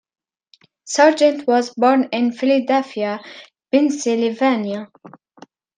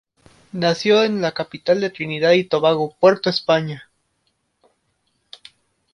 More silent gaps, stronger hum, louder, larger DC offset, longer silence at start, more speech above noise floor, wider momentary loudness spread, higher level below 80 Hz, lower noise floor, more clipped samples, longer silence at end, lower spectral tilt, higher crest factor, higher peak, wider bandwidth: neither; neither; about the same, -18 LUFS vs -18 LUFS; neither; first, 0.85 s vs 0.55 s; second, 39 dB vs 51 dB; first, 12 LU vs 9 LU; second, -74 dBFS vs -62 dBFS; second, -56 dBFS vs -69 dBFS; neither; second, 0.95 s vs 2.1 s; second, -4 dB/octave vs -5.5 dB/octave; about the same, 18 dB vs 18 dB; about the same, -2 dBFS vs -2 dBFS; second, 9.6 kHz vs 11 kHz